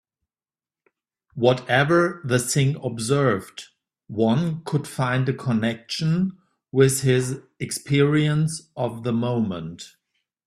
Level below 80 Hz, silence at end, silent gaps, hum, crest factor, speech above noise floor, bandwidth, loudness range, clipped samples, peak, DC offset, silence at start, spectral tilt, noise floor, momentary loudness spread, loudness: -58 dBFS; 0.6 s; none; none; 18 dB; over 68 dB; 14.5 kHz; 2 LU; under 0.1%; -4 dBFS; under 0.1%; 1.35 s; -5.5 dB/octave; under -90 dBFS; 12 LU; -22 LUFS